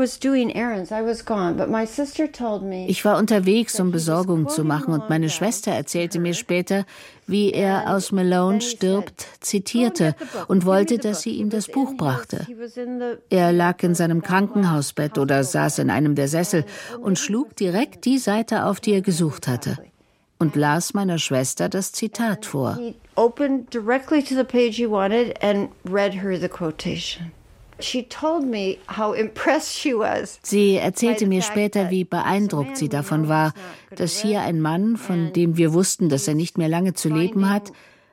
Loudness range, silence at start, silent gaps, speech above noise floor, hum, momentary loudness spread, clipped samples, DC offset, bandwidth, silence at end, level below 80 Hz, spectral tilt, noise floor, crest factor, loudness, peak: 3 LU; 0 s; none; 40 dB; none; 8 LU; under 0.1%; under 0.1%; 16.5 kHz; 0.4 s; -58 dBFS; -5 dB/octave; -61 dBFS; 18 dB; -22 LUFS; -4 dBFS